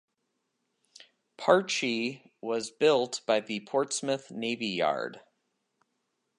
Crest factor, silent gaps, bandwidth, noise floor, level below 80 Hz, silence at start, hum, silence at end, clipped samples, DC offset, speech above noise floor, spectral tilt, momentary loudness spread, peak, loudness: 24 dB; none; 11.5 kHz; -80 dBFS; -82 dBFS; 1.4 s; none; 1.2 s; under 0.1%; under 0.1%; 51 dB; -3.5 dB/octave; 9 LU; -8 dBFS; -29 LUFS